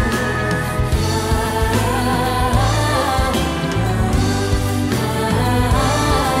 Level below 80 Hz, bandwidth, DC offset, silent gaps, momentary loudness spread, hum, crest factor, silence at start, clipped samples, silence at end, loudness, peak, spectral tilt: -24 dBFS; 16 kHz; under 0.1%; none; 3 LU; none; 14 dB; 0 s; under 0.1%; 0 s; -18 LUFS; -2 dBFS; -5 dB/octave